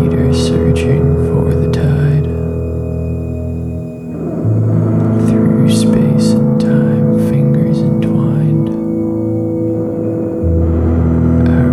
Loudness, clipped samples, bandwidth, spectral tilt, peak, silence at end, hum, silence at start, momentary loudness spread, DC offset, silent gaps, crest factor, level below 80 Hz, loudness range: -13 LUFS; under 0.1%; 12.5 kHz; -8.5 dB/octave; 0 dBFS; 0 s; none; 0 s; 8 LU; under 0.1%; none; 12 dB; -26 dBFS; 5 LU